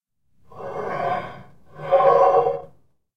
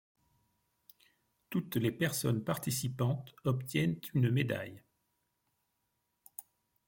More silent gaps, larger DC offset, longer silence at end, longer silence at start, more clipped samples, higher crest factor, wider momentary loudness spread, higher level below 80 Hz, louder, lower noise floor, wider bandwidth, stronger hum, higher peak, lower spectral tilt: neither; first, 0.5% vs under 0.1%; about the same, 0.5 s vs 0.45 s; second, 0.55 s vs 1.5 s; neither; about the same, 20 dB vs 18 dB; first, 22 LU vs 17 LU; first, -60 dBFS vs -68 dBFS; first, -20 LUFS vs -34 LUFS; second, -57 dBFS vs -82 dBFS; second, 6.2 kHz vs 17 kHz; neither; first, -4 dBFS vs -18 dBFS; about the same, -6.5 dB/octave vs -5.5 dB/octave